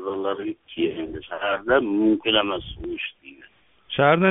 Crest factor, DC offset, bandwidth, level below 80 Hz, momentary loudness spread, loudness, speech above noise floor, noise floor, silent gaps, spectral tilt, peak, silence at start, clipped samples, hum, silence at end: 20 dB; under 0.1%; 3.9 kHz; -50 dBFS; 13 LU; -23 LUFS; 32 dB; -54 dBFS; none; -3 dB/octave; -4 dBFS; 0 s; under 0.1%; none; 0 s